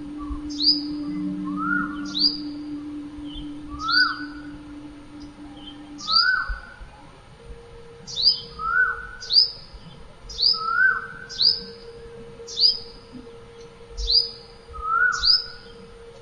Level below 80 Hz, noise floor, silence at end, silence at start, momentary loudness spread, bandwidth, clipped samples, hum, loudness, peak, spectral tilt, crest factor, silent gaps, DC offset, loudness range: -44 dBFS; -46 dBFS; 0 s; 0 s; 23 LU; 11 kHz; under 0.1%; none; -21 LUFS; -4 dBFS; -2.5 dB/octave; 20 dB; none; under 0.1%; 5 LU